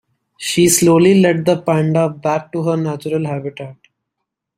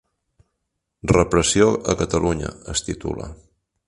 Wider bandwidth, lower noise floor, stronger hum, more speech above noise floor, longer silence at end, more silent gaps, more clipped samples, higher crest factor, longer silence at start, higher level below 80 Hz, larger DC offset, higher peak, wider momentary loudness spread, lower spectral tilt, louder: first, 16 kHz vs 11.5 kHz; about the same, -78 dBFS vs -78 dBFS; neither; first, 63 dB vs 57 dB; first, 0.85 s vs 0.5 s; neither; neither; second, 14 dB vs 22 dB; second, 0.4 s vs 1.05 s; second, -56 dBFS vs -38 dBFS; neither; about the same, -2 dBFS vs 0 dBFS; about the same, 15 LU vs 14 LU; about the same, -5 dB/octave vs -4.5 dB/octave; first, -15 LUFS vs -20 LUFS